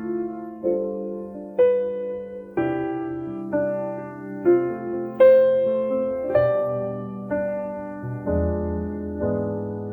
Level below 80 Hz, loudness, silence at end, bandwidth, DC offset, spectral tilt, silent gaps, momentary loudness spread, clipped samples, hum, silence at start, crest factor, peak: -44 dBFS; -24 LUFS; 0 s; 4 kHz; under 0.1%; -10.5 dB/octave; none; 12 LU; under 0.1%; none; 0 s; 18 dB; -6 dBFS